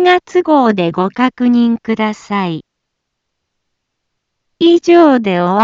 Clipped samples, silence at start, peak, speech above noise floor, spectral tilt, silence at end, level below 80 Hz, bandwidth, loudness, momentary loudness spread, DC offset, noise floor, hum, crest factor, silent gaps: under 0.1%; 0 s; 0 dBFS; 62 dB; -6.5 dB/octave; 0 s; -58 dBFS; 7.6 kHz; -12 LUFS; 10 LU; under 0.1%; -73 dBFS; none; 12 dB; none